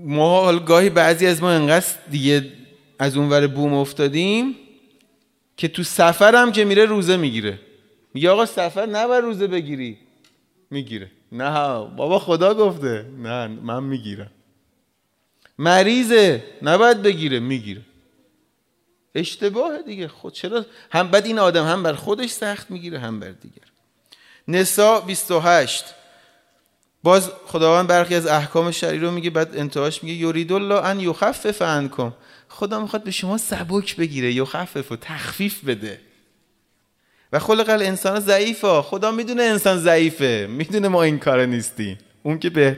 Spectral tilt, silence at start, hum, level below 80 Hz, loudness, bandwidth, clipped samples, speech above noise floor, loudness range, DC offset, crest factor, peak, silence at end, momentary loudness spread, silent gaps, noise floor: -4.5 dB/octave; 0 s; none; -62 dBFS; -19 LUFS; 16 kHz; under 0.1%; 50 dB; 7 LU; under 0.1%; 18 dB; 0 dBFS; 0 s; 15 LU; none; -68 dBFS